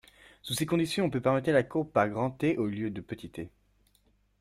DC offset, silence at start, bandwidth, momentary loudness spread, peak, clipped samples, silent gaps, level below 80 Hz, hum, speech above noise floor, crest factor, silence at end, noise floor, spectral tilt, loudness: under 0.1%; 0.45 s; 16 kHz; 15 LU; -12 dBFS; under 0.1%; none; -62 dBFS; 50 Hz at -60 dBFS; 39 dB; 20 dB; 0.9 s; -68 dBFS; -5.5 dB/octave; -29 LUFS